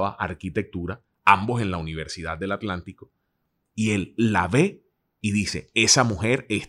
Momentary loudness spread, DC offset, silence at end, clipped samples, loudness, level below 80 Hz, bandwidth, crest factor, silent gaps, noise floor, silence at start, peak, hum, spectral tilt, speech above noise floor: 14 LU; under 0.1%; 0 s; under 0.1%; -23 LUFS; -52 dBFS; 13.5 kHz; 24 dB; none; -75 dBFS; 0 s; 0 dBFS; none; -4 dB/octave; 51 dB